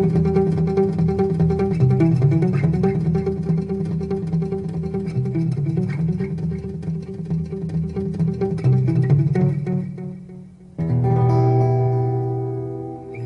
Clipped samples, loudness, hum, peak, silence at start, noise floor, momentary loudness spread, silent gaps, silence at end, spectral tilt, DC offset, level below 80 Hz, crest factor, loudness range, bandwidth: under 0.1%; -21 LUFS; none; -4 dBFS; 0 s; -40 dBFS; 11 LU; none; 0 s; -10.5 dB/octave; under 0.1%; -42 dBFS; 14 dB; 5 LU; 6 kHz